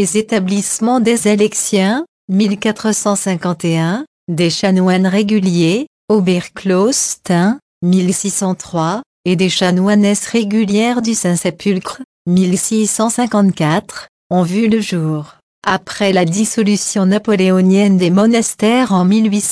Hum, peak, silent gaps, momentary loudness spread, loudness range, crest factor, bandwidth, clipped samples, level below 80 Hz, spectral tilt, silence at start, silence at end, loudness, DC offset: none; -2 dBFS; 2.08-2.28 s, 4.07-4.27 s, 5.87-6.08 s, 7.62-7.81 s, 9.06-9.24 s, 12.04-12.25 s, 14.09-14.30 s, 15.43-15.62 s; 7 LU; 3 LU; 12 dB; 11 kHz; under 0.1%; -56 dBFS; -5 dB/octave; 0 s; 0 s; -14 LUFS; under 0.1%